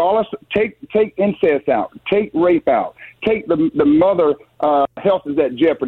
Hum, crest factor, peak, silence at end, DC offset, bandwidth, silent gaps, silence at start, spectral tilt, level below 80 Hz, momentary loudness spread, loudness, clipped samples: none; 12 dB; -4 dBFS; 0 s; under 0.1%; 4.2 kHz; none; 0 s; -9 dB/octave; -50 dBFS; 6 LU; -17 LUFS; under 0.1%